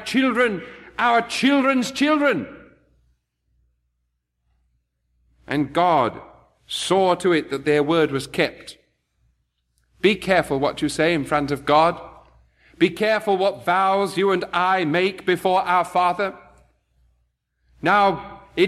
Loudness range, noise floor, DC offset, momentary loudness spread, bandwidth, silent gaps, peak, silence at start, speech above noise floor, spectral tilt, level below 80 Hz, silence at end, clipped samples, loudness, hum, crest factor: 6 LU; -74 dBFS; under 0.1%; 9 LU; 14 kHz; none; -4 dBFS; 0 s; 55 dB; -5 dB/octave; -56 dBFS; 0 s; under 0.1%; -20 LUFS; 60 Hz at -55 dBFS; 18 dB